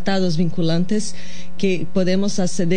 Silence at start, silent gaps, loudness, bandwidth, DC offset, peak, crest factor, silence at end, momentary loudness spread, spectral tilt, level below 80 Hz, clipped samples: 0 s; none; -21 LUFS; 10 kHz; 10%; -6 dBFS; 14 dB; 0 s; 9 LU; -5.5 dB/octave; -50 dBFS; under 0.1%